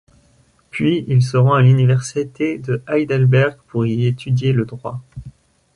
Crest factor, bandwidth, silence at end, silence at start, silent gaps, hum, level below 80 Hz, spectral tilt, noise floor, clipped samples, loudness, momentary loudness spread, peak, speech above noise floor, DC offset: 14 dB; 11 kHz; 0.45 s; 0.75 s; none; none; -50 dBFS; -7.5 dB/octave; -55 dBFS; under 0.1%; -17 LUFS; 17 LU; -4 dBFS; 39 dB; under 0.1%